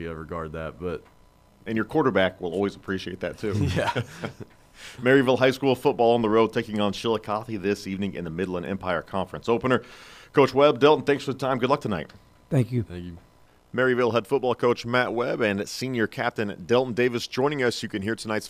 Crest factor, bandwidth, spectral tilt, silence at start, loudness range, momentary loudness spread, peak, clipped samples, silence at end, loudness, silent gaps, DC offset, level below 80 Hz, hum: 20 dB; 15.5 kHz; -6 dB/octave; 0 s; 5 LU; 14 LU; -6 dBFS; under 0.1%; 0 s; -25 LUFS; none; under 0.1%; -54 dBFS; none